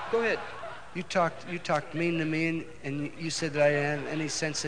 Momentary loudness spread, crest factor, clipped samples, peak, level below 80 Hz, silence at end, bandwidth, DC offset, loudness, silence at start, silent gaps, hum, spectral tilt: 11 LU; 18 dB; under 0.1%; -12 dBFS; -62 dBFS; 0 s; 10 kHz; 0.5%; -30 LUFS; 0 s; none; none; -4.5 dB/octave